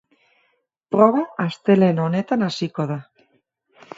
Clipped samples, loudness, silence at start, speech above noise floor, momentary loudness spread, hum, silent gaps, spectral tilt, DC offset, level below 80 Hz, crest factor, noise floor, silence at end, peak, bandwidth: under 0.1%; -20 LUFS; 0.9 s; 49 dB; 10 LU; none; none; -7.5 dB/octave; under 0.1%; -68 dBFS; 20 dB; -68 dBFS; 0.95 s; 0 dBFS; 7.8 kHz